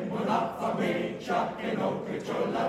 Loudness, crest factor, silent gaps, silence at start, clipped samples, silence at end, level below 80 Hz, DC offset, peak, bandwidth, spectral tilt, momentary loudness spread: -30 LUFS; 16 dB; none; 0 s; under 0.1%; 0 s; -64 dBFS; under 0.1%; -14 dBFS; 15 kHz; -6.5 dB/octave; 3 LU